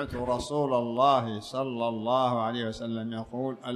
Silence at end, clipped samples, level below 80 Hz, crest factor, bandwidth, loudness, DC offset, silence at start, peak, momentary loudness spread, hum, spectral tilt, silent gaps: 0 s; under 0.1%; -54 dBFS; 18 dB; 13 kHz; -29 LUFS; under 0.1%; 0 s; -10 dBFS; 10 LU; none; -6 dB/octave; none